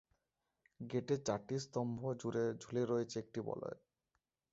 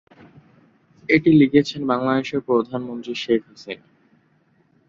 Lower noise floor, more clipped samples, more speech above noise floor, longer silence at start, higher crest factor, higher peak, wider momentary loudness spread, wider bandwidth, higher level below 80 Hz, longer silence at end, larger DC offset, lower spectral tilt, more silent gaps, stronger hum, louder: first, -88 dBFS vs -61 dBFS; neither; first, 48 dB vs 42 dB; second, 0.8 s vs 1.1 s; about the same, 20 dB vs 20 dB; second, -22 dBFS vs -2 dBFS; second, 8 LU vs 21 LU; about the same, 7.6 kHz vs 7.4 kHz; second, -76 dBFS vs -60 dBFS; second, 0.75 s vs 1.1 s; neither; about the same, -6.5 dB/octave vs -7 dB/octave; neither; neither; second, -41 LUFS vs -20 LUFS